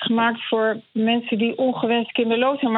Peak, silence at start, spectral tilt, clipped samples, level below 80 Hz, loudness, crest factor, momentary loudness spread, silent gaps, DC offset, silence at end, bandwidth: -8 dBFS; 0 s; -9 dB/octave; under 0.1%; -76 dBFS; -21 LUFS; 14 dB; 3 LU; none; under 0.1%; 0 s; 4.1 kHz